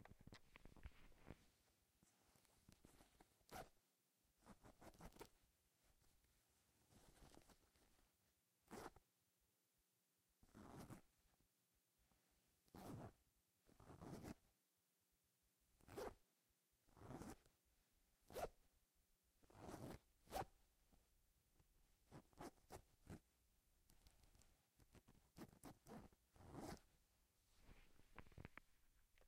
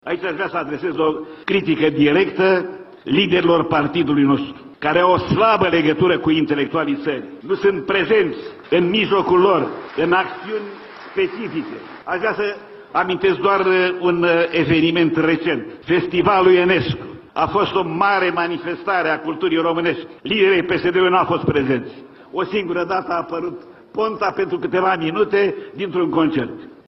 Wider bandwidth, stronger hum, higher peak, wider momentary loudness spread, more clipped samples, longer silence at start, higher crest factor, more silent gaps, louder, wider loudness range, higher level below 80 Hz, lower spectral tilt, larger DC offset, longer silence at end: first, 15.5 kHz vs 6 kHz; neither; second, -38 dBFS vs -2 dBFS; about the same, 13 LU vs 11 LU; neither; about the same, 0 s vs 0.05 s; first, 26 dB vs 16 dB; neither; second, -62 LUFS vs -18 LUFS; first, 8 LU vs 5 LU; second, -76 dBFS vs -52 dBFS; second, -5 dB/octave vs -8 dB/octave; neither; second, 0 s vs 0.15 s